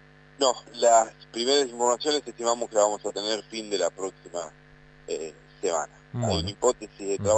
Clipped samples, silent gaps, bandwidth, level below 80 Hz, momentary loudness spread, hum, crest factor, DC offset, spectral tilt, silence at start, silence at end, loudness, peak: under 0.1%; none; 9.2 kHz; -56 dBFS; 14 LU; 50 Hz at -55 dBFS; 20 dB; under 0.1%; -3 dB/octave; 0.4 s; 0 s; -26 LUFS; -8 dBFS